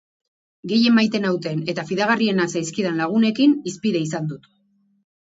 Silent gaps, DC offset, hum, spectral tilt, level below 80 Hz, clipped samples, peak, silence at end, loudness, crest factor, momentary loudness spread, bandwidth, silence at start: none; under 0.1%; none; -5 dB/octave; -66 dBFS; under 0.1%; -4 dBFS; 0.85 s; -20 LUFS; 18 dB; 9 LU; 8 kHz; 0.65 s